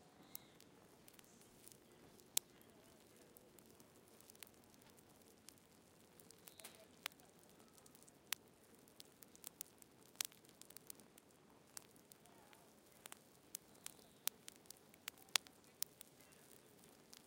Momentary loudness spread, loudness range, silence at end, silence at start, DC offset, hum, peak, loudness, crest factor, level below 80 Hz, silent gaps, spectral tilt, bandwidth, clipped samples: 19 LU; 14 LU; 0 s; 0 s; under 0.1%; none; -8 dBFS; -50 LUFS; 46 dB; -88 dBFS; none; 0 dB/octave; 17 kHz; under 0.1%